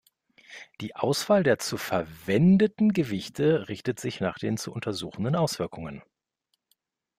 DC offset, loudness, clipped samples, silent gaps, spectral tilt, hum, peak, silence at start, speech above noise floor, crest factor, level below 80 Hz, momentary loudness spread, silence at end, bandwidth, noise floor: under 0.1%; -26 LUFS; under 0.1%; none; -6 dB/octave; none; -10 dBFS; 0.5 s; 53 dB; 18 dB; -60 dBFS; 18 LU; 1.2 s; 15.5 kHz; -78 dBFS